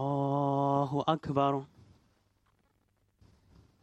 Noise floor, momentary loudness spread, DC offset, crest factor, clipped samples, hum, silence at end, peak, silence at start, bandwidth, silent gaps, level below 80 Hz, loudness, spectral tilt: -73 dBFS; 2 LU; under 0.1%; 20 dB; under 0.1%; none; 2.15 s; -12 dBFS; 0 s; 8 kHz; none; -66 dBFS; -30 LUFS; -8.5 dB/octave